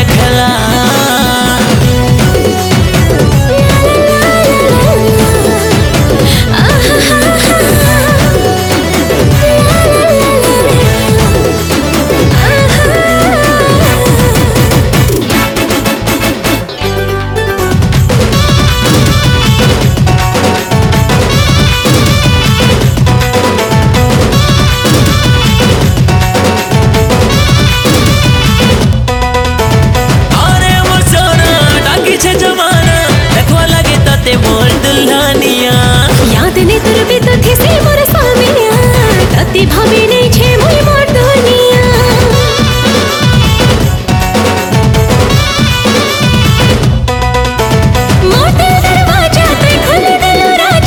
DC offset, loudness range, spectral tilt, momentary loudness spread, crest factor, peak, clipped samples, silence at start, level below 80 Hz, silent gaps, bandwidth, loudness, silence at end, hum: under 0.1%; 1 LU; -5 dB/octave; 3 LU; 6 dB; 0 dBFS; 0.6%; 0 s; -18 dBFS; none; 19.5 kHz; -7 LUFS; 0 s; none